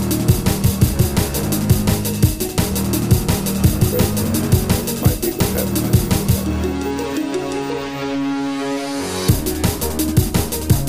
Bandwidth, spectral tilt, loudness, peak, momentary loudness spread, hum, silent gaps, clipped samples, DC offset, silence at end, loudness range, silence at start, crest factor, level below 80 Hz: 15.5 kHz; -5.5 dB/octave; -18 LUFS; -2 dBFS; 6 LU; none; none; under 0.1%; 0.7%; 0 s; 4 LU; 0 s; 16 dB; -28 dBFS